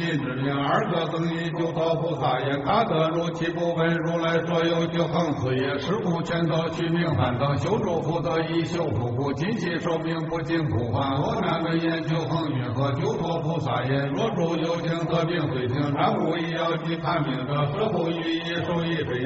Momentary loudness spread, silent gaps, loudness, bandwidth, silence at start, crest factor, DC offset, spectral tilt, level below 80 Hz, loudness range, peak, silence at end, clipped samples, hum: 3 LU; none; -25 LUFS; 8 kHz; 0 s; 14 dB; under 0.1%; -5.5 dB/octave; -52 dBFS; 2 LU; -10 dBFS; 0 s; under 0.1%; none